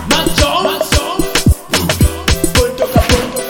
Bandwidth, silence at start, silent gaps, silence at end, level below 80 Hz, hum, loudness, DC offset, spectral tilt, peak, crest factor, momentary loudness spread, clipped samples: 19.5 kHz; 0 s; none; 0 s; -20 dBFS; none; -13 LUFS; under 0.1%; -4 dB/octave; 0 dBFS; 12 dB; 3 LU; under 0.1%